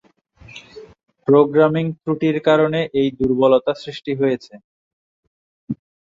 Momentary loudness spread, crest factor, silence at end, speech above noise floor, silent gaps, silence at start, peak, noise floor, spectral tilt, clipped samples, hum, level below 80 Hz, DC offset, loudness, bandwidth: 17 LU; 18 dB; 0.4 s; 30 dB; 4.64-5.67 s; 0.55 s; -2 dBFS; -47 dBFS; -8 dB/octave; under 0.1%; none; -54 dBFS; under 0.1%; -18 LUFS; 7.4 kHz